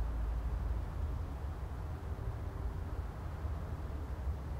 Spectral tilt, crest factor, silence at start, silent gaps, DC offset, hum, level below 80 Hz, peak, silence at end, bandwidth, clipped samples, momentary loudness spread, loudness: -8 dB/octave; 12 dB; 0 s; none; under 0.1%; none; -40 dBFS; -26 dBFS; 0 s; 14.5 kHz; under 0.1%; 4 LU; -42 LUFS